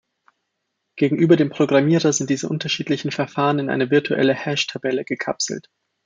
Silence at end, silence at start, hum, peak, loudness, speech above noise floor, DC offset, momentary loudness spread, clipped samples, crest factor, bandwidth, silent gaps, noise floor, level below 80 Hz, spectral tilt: 0.45 s; 0.95 s; none; -2 dBFS; -20 LUFS; 57 dB; under 0.1%; 8 LU; under 0.1%; 18 dB; 9.4 kHz; none; -76 dBFS; -66 dBFS; -5 dB/octave